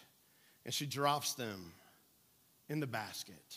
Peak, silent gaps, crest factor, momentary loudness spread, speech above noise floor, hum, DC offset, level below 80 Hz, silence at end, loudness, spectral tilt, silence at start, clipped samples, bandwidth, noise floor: -18 dBFS; none; 24 dB; 16 LU; 31 dB; none; under 0.1%; -84 dBFS; 0 s; -39 LUFS; -3.5 dB/octave; 0 s; under 0.1%; 15.5 kHz; -70 dBFS